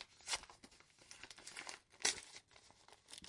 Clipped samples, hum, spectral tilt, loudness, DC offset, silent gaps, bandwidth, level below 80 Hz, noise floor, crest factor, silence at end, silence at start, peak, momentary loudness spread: under 0.1%; none; 1 dB/octave; -44 LUFS; under 0.1%; none; 12 kHz; -76 dBFS; -67 dBFS; 32 dB; 0 s; 0 s; -18 dBFS; 25 LU